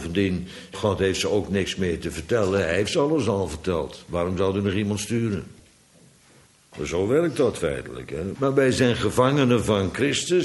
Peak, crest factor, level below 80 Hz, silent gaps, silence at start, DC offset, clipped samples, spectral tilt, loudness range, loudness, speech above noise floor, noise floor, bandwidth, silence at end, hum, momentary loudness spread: -6 dBFS; 18 dB; -46 dBFS; none; 0 s; under 0.1%; under 0.1%; -5.5 dB/octave; 5 LU; -24 LUFS; 32 dB; -55 dBFS; 12 kHz; 0 s; none; 10 LU